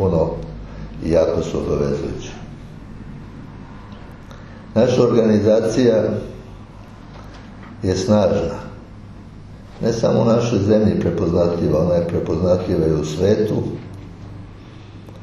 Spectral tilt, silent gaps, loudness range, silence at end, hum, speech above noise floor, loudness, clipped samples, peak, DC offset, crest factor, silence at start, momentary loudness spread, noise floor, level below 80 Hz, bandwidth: -7.5 dB/octave; none; 6 LU; 0 s; none; 21 dB; -18 LUFS; under 0.1%; -2 dBFS; under 0.1%; 18 dB; 0 s; 23 LU; -38 dBFS; -38 dBFS; 12 kHz